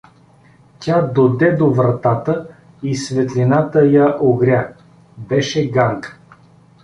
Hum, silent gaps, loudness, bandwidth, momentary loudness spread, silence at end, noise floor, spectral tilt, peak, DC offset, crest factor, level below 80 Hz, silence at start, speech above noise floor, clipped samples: none; none; -16 LUFS; 10.5 kHz; 11 LU; 0.7 s; -49 dBFS; -7 dB/octave; -2 dBFS; under 0.1%; 14 dB; -52 dBFS; 0.8 s; 34 dB; under 0.1%